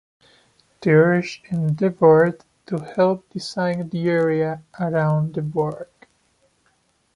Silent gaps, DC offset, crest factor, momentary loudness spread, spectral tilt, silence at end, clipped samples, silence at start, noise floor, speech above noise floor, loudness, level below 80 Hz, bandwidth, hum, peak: none; under 0.1%; 18 dB; 14 LU; -8 dB/octave; 1.3 s; under 0.1%; 0.8 s; -64 dBFS; 45 dB; -20 LUFS; -62 dBFS; 11 kHz; none; -2 dBFS